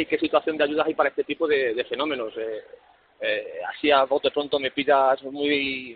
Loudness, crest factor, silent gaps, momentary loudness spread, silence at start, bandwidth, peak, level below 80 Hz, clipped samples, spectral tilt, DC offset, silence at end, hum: -24 LUFS; 20 dB; none; 10 LU; 0 s; 4.8 kHz; -6 dBFS; -64 dBFS; under 0.1%; -1 dB/octave; under 0.1%; 0 s; none